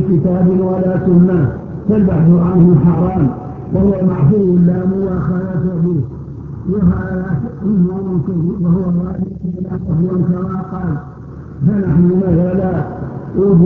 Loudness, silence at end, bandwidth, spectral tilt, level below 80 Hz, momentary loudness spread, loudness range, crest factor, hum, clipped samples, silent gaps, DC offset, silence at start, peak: -14 LUFS; 0 s; 2.7 kHz; -13 dB/octave; -32 dBFS; 11 LU; 5 LU; 14 dB; none; under 0.1%; none; under 0.1%; 0 s; 0 dBFS